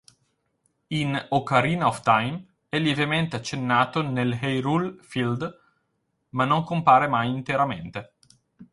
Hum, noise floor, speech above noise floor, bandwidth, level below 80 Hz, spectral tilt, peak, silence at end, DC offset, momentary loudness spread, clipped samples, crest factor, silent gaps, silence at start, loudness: none; -74 dBFS; 51 dB; 11.5 kHz; -60 dBFS; -6 dB/octave; -2 dBFS; 0.1 s; under 0.1%; 12 LU; under 0.1%; 22 dB; none; 0.9 s; -24 LUFS